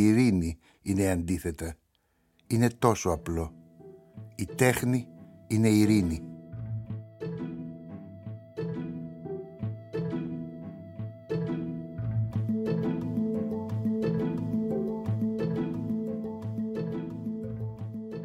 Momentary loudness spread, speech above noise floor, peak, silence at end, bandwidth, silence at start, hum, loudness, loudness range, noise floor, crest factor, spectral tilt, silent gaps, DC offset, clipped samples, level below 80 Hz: 16 LU; 45 dB; -6 dBFS; 0 s; 16.5 kHz; 0 s; none; -30 LUFS; 9 LU; -71 dBFS; 24 dB; -6.5 dB/octave; none; under 0.1%; under 0.1%; -52 dBFS